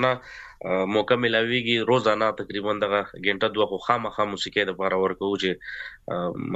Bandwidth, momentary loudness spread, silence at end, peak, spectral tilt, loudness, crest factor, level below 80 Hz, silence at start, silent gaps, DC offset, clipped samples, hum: 8.2 kHz; 10 LU; 0 s; -4 dBFS; -5 dB/octave; -24 LUFS; 20 dB; -58 dBFS; 0 s; none; under 0.1%; under 0.1%; none